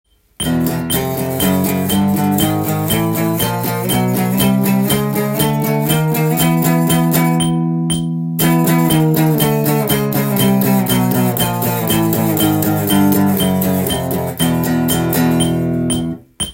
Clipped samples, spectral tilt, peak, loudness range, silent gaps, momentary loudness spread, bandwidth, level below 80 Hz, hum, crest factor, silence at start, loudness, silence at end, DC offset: under 0.1%; -5.5 dB/octave; 0 dBFS; 2 LU; none; 4 LU; 17 kHz; -42 dBFS; none; 14 dB; 0.4 s; -15 LUFS; 0 s; under 0.1%